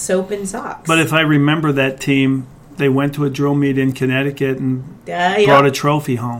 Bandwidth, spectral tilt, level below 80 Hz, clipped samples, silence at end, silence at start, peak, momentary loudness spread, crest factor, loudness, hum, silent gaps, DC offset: 16.5 kHz; -5.5 dB/octave; -50 dBFS; under 0.1%; 0 s; 0 s; 0 dBFS; 12 LU; 16 dB; -16 LUFS; none; none; under 0.1%